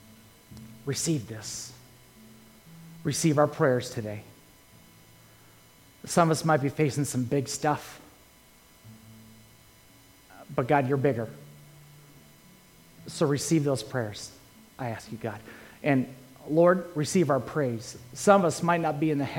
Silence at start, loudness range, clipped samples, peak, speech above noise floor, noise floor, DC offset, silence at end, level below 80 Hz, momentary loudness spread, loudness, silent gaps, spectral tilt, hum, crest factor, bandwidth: 0.5 s; 6 LU; under 0.1%; -4 dBFS; 30 dB; -56 dBFS; under 0.1%; 0 s; -64 dBFS; 20 LU; -27 LUFS; none; -5.5 dB/octave; none; 24 dB; 17 kHz